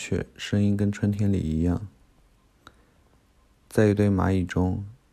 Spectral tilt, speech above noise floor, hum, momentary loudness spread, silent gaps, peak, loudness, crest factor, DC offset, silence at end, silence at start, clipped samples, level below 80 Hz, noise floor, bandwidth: -7.5 dB/octave; 37 dB; none; 9 LU; none; -8 dBFS; -25 LUFS; 18 dB; under 0.1%; 0.2 s; 0 s; under 0.1%; -46 dBFS; -61 dBFS; 12.5 kHz